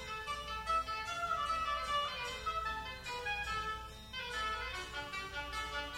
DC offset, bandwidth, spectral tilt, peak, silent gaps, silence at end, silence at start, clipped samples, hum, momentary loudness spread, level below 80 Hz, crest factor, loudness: under 0.1%; 16 kHz; -2.5 dB/octave; -26 dBFS; none; 0 s; 0 s; under 0.1%; none; 7 LU; -54 dBFS; 14 dB; -38 LUFS